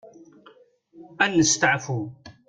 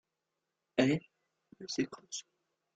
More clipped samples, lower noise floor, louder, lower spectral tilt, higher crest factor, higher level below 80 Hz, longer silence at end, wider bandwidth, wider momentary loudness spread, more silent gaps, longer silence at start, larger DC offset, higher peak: neither; second, -55 dBFS vs -87 dBFS; first, -21 LUFS vs -35 LUFS; second, -3 dB/octave vs -5 dB/octave; about the same, 20 dB vs 24 dB; first, -58 dBFS vs -76 dBFS; second, 0.15 s vs 0.55 s; about the same, 9.6 kHz vs 9.2 kHz; about the same, 13 LU vs 14 LU; neither; second, 0.05 s vs 0.75 s; neither; first, -6 dBFS vs -14 dBFS